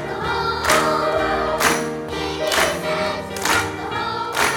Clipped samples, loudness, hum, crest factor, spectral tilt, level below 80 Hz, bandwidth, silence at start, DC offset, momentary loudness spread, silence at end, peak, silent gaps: under 0.1%; -20 LUFS; none; 18 dB; -3 dB/octave; -42 dBFS; 18 kHz; 0 s; under 0.1%; 8 LU; 0 s; -2 dBFS; none